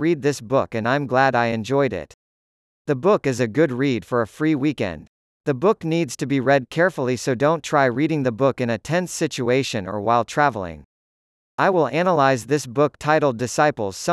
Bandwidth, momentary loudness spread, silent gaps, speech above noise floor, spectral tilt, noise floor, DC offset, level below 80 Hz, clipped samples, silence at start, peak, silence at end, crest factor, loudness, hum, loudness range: 12 kHz; 7 LU; 2.14-2.85 s, 5.08-5.44 s, 10.85-11.58 s; over 70 dB; -5.5 dB/octave; under -90 dBFS; under 0.1%; -58 dBFS; under 0.1%; 0 s; -4 dBFS; 0 s; 16 dB; -21 LUFS; none; 2 LU